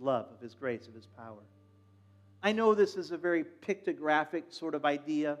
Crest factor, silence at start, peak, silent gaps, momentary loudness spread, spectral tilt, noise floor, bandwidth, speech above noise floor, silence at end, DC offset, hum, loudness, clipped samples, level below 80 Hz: 20 dB; 0 s; -14 dBFS; none; 22 LU; -5.5 dB/octave; -62 dBFS; 10.5 kHz; 29 dB; 0 s; under 0.1%; none; -32 LUFS; under 0.1%; under -90 dBFS